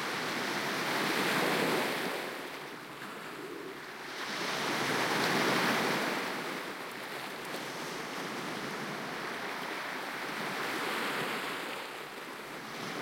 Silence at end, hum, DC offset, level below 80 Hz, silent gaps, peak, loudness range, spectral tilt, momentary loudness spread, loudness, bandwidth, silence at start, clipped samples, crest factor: 0 s; none; under 0.1%; -76 dBFS; none; -16 dBFS; 6 LU; -3 dB/octave; 13 LU; -34 LUFS; 16.5 kHz; 0 s; under 0.1%; 20 dB